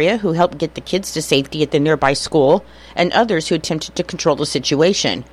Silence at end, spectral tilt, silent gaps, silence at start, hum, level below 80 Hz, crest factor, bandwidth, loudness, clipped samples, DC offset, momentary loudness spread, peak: 0.1 s; -4.5 dB/octave; none; 0 s; none; -46 dBFS; 16 dB; 15 kHz; -17 LUFS; under 0.1%; under 0.1%; 7 LU; -2 dBFS